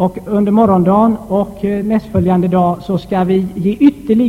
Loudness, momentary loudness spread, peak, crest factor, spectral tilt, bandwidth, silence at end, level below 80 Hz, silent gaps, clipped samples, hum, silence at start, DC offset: -13 LUFS; 7 LU; 0 dBFS; 12 dB; -9.5 dB/octave; 13 kHz; 0 s; -40 dBFS; none; under 0.1%; none; 0 s; under 0.1%